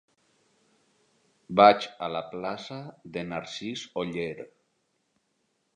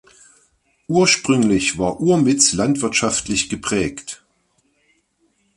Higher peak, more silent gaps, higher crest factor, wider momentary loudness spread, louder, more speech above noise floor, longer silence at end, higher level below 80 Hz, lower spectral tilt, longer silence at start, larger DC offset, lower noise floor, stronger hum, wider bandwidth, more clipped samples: second, -4 dBFS vs 0 dBFS; neither; first, 26 dB vs 20 dB; first, 21 LU vs 9 LU; second, -27 LUFS vs -17 LUFS; about the same, 48 dB vs 47 dB; about the same, 1.3 s vs 1.4 s; second, -68 dBFS vs -48 dBFS; first, -5 dB/octave vs -3.5 dB/octave; first, 1.5 s vs 0.9 s; neither; first, -75 dBFS vs -64 dBFS; neither; second, 9.4 kHz vs 11.5 kHz; neither